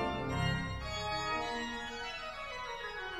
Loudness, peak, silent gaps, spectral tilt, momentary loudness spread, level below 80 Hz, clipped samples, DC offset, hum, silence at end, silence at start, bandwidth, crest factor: -37 LUFS; -22 dBFS; none; -4.5 dB/octave; 7 LU; -50 dBFS; under 0.1%; under 0.1%; none; 0 s; 0 s; 15 kHz; 16 dB